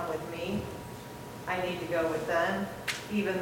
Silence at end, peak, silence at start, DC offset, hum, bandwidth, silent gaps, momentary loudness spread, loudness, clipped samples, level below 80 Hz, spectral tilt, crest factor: 0 s; -14 dBFS; 0 s; under 0.1%; none; 17 kHz; none; 13 LU; -33 LUFS; under 0.1%; -58 dBFS; -5 dB/octave; 18 dB